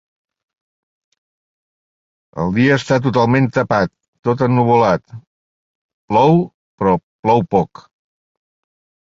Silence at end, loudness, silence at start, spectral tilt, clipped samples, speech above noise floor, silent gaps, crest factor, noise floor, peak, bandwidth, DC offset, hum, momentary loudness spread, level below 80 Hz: 1.35 s; -16 LUFS; 2.35 s; -7.5 dB/octave; under 0.1%; over 75 dB; 4.08-4.13 s, 4.19-4.23 s, 5.27-6.08 s, 6.54-6.78 s, 7.03-7.23 s; 18 dB; under -90 dBFS; 0 dBFS; 7.8 kHz; under 0.1%; none; 10 LU; -48 dBFS